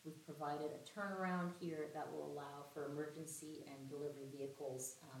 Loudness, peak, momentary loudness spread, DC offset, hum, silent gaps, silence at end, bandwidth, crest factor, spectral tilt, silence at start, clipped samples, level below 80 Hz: -48 LUFS; -32 dBFS; 8 LU; under 0.1%; none; none; 0 s; 17 kHz; 16 dB; -5 dB/octave; 0 s; under 0.1%; under -90 dBFS